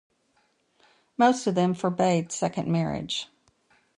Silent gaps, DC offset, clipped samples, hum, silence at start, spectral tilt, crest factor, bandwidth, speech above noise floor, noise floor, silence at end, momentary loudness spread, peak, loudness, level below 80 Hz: none; under 0.1%; under 0.1%; none; 1.2 s; -5.5 dB/octave; 20 dB; 11 kHz; 44 dB; -69 dBFS; 0.75 s; 10 LU; -8 dBFS; -25 LUFS; -62 dBFS